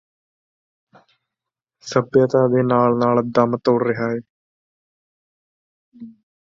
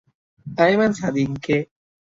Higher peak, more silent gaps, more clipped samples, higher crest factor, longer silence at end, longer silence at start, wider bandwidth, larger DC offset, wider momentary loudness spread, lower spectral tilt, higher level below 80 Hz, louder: about the same, -2 dBFS vs -4 dBFS; first, 4.29-5.92 s vs none; neither; about the same, 20 dB vs 18 dB; second, 0.35 s vs 0.55 s; first, 1.85 s vs 0.45 s; about the same, 7.4 kHz vs 7.8 kHz; neither; second, 8 LU vs 12 LU; about the same, -7.5 dB/octave vs -6.5 dB/octave; second, -62 dBFS vs -56 dBFS; about the same, -18 LUFS vs -20 LUFS